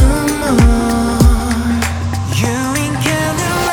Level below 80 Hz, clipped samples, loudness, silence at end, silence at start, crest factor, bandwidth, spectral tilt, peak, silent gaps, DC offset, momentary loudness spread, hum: -18 dBFS; under 0.1%; -14 LUFS; 0 s; 0 s; 12 dB; 20 kHz; -5 dB/octave; 0 dBFS; none; under 0.1%; 5 LU; none